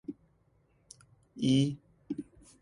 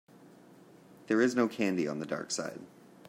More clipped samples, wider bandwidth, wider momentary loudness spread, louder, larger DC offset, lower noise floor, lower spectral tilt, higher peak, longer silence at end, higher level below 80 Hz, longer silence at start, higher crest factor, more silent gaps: neither; second, 11.5 kHz vs 16 kHz; first, 24 LU vs 11 LU; about the same, -32 LUFS vs -31 LUFS; neither; first, -69 dBFS vs -57 dBFS; first, -6.5 dB/octave vs -4.5 dB/octave; about the same, -16 dBFS vs -14 dBFS; about the same, 0.4 s vs 0.4 s; first, -66 dBFS vs -80 dBFS; about the same, 0.1 s vs 0.2 s; about the same, 20 dB vs 20 dB; neither